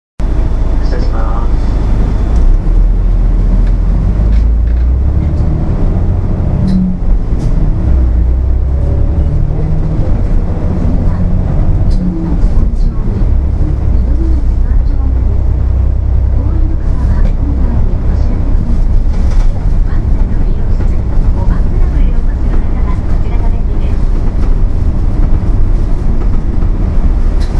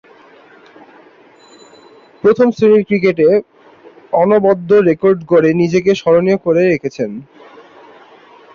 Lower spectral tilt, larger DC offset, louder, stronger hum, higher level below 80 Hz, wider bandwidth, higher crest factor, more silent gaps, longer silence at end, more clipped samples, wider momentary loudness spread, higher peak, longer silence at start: first, -9.5 dB/octave vs -7.5 dB/octave; neither; about the same, -14 LUFS vs -13 LUFS; neither; first, -10 dBFS vs -56 dBFS; second, 5.6 kHz vs 7.4 kHz; second, 8 dB vs 14 dB; neither; second, 0 s vs 1.35 s; neither; second, 3 LU vs 7 LU; about the same, 0 dBFS vs 0 dBFS; second, 0.2 s vs 2.25 s